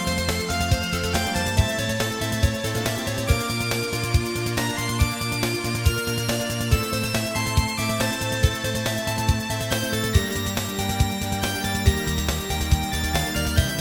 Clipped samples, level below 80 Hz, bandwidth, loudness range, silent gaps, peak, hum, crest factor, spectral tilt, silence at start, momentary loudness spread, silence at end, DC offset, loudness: under 0.1%; -30 dBFS; over 20 kHz; 1 LU; none; -4 dBFS; none; 20 dB; -4 dB/octave; 0 s; 3 LU; 0 s; under 0.1%; -24 LUFS